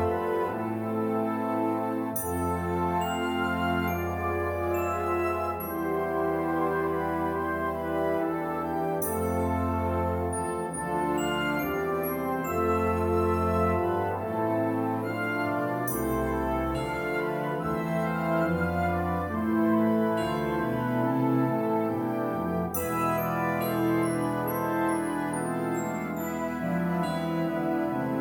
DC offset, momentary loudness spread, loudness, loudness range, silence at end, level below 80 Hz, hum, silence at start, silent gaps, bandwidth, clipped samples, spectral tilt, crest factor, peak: under 0.1%; 4 LU; -28 LUFS; 2 LU; 0 s; -48 dBFS; none; 0 s; none; 18 kHz; under 0.1%; -6.5 dB/octave; 14 dB; -14 dBFS